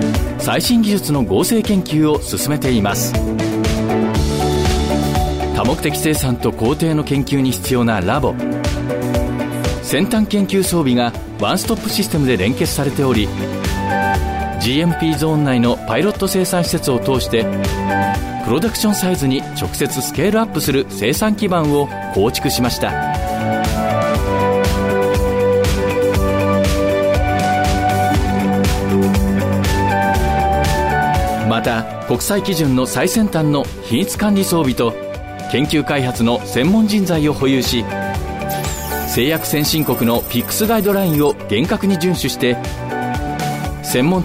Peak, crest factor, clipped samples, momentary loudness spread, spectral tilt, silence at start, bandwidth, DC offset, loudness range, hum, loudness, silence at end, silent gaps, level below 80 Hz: -4 dBFS; 12 dB; under 0.1%; 5 LU; -5 dB/octave; 0 s; 16.5 kHz; under 0.1%; 2 LU; none; -17 LUFS; 0 s; none; -28 dBFS